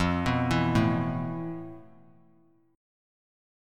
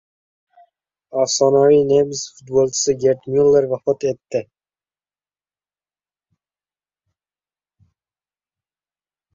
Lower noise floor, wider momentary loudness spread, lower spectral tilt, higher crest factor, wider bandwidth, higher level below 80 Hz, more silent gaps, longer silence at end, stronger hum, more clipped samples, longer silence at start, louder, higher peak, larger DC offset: second, -63 dBFS vs under -90 dBFS; about the same, 14 LU vs 13 LU; first, -7 dB/octave vs -4.5 dB/octave; about the same, 18 dB vs 18 dB; first, 13.5 kHz vs 7.8 kHz; first, -48 dBFS vs -60 dBFS; neither; second, 1.9 s vs 4.9 s; second, none vs 50 Hz at -60 dBFS; neither; second, 0 s vs 1.15 s; second, -28 LUFS vs -17 LUFS; second, -12 dBFS vs -4 dBFS; neither